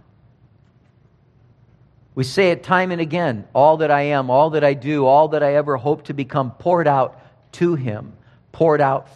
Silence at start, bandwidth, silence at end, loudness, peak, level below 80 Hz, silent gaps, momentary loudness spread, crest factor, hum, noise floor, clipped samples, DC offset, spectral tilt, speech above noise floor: 2.15 s; 12 kHz; 0.15 s; -18 LUFS; -2 dBFS; -60 dBFS; none; 9 LU; 18 dB; none; -55 dBFS; under 0.1%; under 0.1%; -7 dB/octave; 37 dB